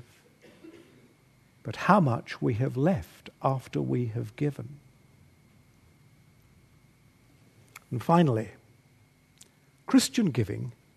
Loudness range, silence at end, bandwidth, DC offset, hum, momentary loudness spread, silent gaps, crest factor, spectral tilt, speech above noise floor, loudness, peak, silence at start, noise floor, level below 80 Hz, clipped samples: 9 LU; 0.25 s; 13.5 kHz; under 0.1%; none; 19 LU; none; 26 dB; -6.5 dB/octave; 35 dB; -28 LUFS; -4 dBFS; 0.65 s; -61 dBFS; -62 dBFS; under 0.1%